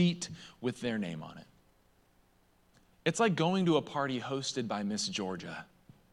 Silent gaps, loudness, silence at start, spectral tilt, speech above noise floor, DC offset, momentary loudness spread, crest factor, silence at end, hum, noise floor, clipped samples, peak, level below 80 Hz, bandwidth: none; -33 LUFS; 0 s; -5 dB/octave; 35 dB; under 0.1%; 15 LU; 20 dB; 0.5 s; none; -68 dBFS; under 0.1%; -14 dBFS; -72 dBFS; 11.5 kHz